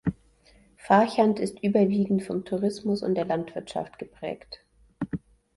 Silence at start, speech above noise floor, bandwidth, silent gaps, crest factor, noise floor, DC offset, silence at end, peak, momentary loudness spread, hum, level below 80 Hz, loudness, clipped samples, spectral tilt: 0.05 s; 33 dB; 11.5 kHz; none; 20 dB; -59 dBFS; under 0.1%; 0.4 s; -6 dBFS; 16 LU; none; -56 dBFS; -26 LUFS; under 0.1%; -7 dB/octave